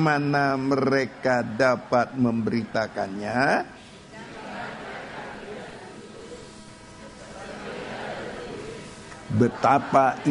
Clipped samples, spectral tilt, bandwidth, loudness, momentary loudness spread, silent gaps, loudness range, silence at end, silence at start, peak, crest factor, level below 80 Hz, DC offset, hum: under 0.1%; -6.5 dB/octave; 10.5 kHz; -24 LUFS; 21 LU; none; 15 LU; 0 s; 0 s; -4 dBFS; 22 dB; -56 dBFS; under 0.1%; none